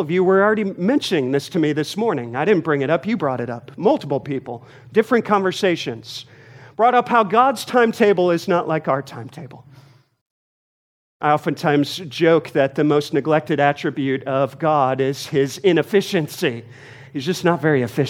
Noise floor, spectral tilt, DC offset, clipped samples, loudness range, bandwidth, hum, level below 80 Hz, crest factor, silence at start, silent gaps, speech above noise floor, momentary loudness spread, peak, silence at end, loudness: -49 dBFS; -6 dB/octave; under 0.1%; under 0.1%; 4 LU; 16.5 kHz; none; -68 dBFS; 18 dB; 0 s; 10.21-11.20 s; 30 dB; 12 LU; -2 dBFS; 0 s; -19 LUFS